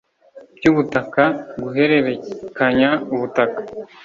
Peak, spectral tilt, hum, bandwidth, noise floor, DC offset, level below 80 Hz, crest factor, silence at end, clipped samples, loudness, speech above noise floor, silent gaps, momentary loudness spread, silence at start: -2 dBFS; -7 dB/octave; none; 7.4 kHz; -45 dBFS; under 0.1%; -54 dBFS; 18 dB; 0.2 s; under 0.1%; -18 LUFS; 27 dB; none; 12 LU; 0.35 s